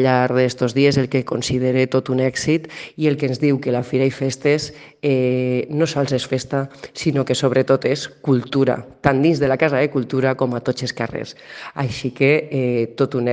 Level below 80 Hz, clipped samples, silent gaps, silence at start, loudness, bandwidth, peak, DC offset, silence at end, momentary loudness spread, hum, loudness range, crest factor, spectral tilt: -52 dBFS; under 0.1%; none; 0 s; -19 LUFS; 9.6 kHz; 0 dBFS; under 0.1%; 0 s; 8 LU; none; 2 LU; 18 dB; -6 dB/octave